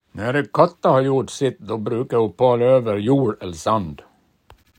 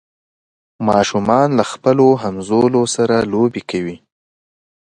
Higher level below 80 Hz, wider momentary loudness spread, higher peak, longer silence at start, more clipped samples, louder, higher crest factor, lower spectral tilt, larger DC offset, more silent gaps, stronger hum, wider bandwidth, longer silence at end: about the same, -56 dBFS vs -52 dBFS; about the same, 8 LU vs 10 LU; about the same, -2 dBFS vs 0 dBFS; second, 0.15 s vs 0.8 s; neither; second, -19 LUFS vs -15 LUFS; about the same, 18 dB vs 16 dB; first, -7 dB/octave vs -5.5 dB/octave; neither; neither; neither; about the same, 10.5 kHz vs 11.5 kHz; second, 0.8 s vs 0.95 s